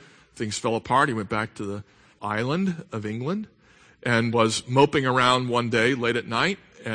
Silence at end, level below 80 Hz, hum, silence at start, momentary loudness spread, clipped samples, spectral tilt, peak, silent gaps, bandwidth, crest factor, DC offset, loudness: 0 s; -58 dBFS; none; 0.35 s; 14 LU; under 0.1%; -5 dB/octave; -4 dBFS; none; 9.8 kHz; 20 dB; under 0.1%; -24 LUFS